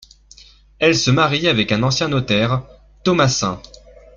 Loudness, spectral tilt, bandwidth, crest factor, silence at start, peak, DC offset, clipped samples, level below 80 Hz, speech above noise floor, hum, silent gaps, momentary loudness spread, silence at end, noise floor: -17 LUFS; -4.5 dB/octave; 7.6 kHz; 16 dB; 0.8 s; -2 dBFS; under 0.1%; under 0.1%; -46 dBFS; 30 dB; none; none; 9 LU; 0.55 s; -46 dBFS